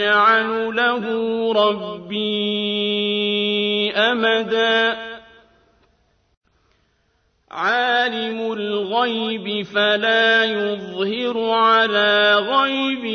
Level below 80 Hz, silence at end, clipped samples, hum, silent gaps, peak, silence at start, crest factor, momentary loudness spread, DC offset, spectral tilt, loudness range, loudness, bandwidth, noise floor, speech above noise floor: -64 dBFS; 0 s; under 0.1%; none; 6.37-6.41 s; -4 dBFS; 0 s; 16 dB; 10 LU; under 0.1%; -4.5 dB/octave; 8 LU; -18 LUFS; 6.6 kHz; -64 dBFS; 45 dB